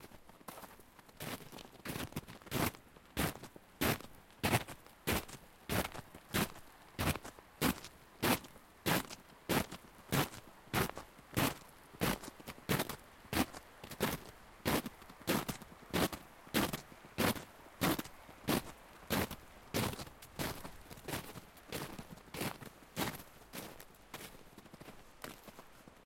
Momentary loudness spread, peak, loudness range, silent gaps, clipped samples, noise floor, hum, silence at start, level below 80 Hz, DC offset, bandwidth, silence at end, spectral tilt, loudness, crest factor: 18 LU; -18 dBFS; 7 LU; none; under 0.1%; -59 dBFS; none; 0 s; -58 dBFS; under 0.1%; 16.5 kHz; 0.1 s; -4 dB/octave; -39 LUFS; 24 dB